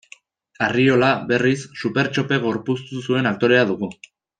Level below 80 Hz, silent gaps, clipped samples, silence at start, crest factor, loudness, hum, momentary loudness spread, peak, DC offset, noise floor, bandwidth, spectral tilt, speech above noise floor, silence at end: -60 dBFS; none; under 0.1%; 0.6 s; 18 dB; -20 LUFS; none; 9 LU; -4 dBFS; under 0.1%; -49 dBFS; 9.2 kHz; -6 dB/octave; 30 dB; 0.5 s